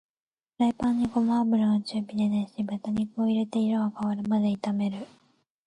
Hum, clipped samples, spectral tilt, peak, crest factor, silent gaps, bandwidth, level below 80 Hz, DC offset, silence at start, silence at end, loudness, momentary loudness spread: none; under 0.1%; -7.5 dB/octave; -14 dBFS; 12 dB; none; 10 kHz; -60 dBFS; under 0.1%; 0.6 s; 0.6 s; -27 LUFS; 8 LU